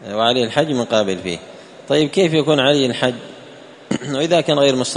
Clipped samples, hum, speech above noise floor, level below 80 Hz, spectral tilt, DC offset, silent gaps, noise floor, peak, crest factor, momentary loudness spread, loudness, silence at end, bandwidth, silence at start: under 0.1%; none; 23 dB; -58 dBFS; -4.5 dB/octave; under 0.1%; none; -40 dBFS; 0 dBFS; 18 dB; 12 LU; -17 LUFS; 0 s; 11 kHz; 0 s